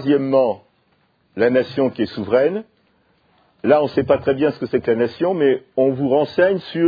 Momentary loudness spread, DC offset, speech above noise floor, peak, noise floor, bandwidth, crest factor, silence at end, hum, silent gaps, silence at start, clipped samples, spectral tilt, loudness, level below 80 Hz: 6 LU; under 0.1%; 45 dB; 0 dBFS; -62 dBFS; 5 kHz; 18 dB; 0 s; none; none; 0 s; under 0.1%; -9 dB/octave; -18 LUFS; -56 dBFS